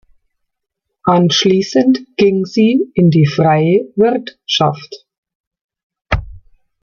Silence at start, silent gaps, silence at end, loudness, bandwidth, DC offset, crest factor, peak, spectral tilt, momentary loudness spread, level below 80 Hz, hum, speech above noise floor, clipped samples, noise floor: 1.05 s; 5.18-5.23 s, 5.35-5.51 s, 5.61-5.69 s, 5.83-5.90 s, 6.01-6.05 s; 0.45 s; -13 LUFS; 7.2 kHz; under 0.1%; 14 dB; 0 dBFS; -6 dB/octave; 10 LU; -36 dBFS; none; 64 dB; under 0.1%; -76 dBFS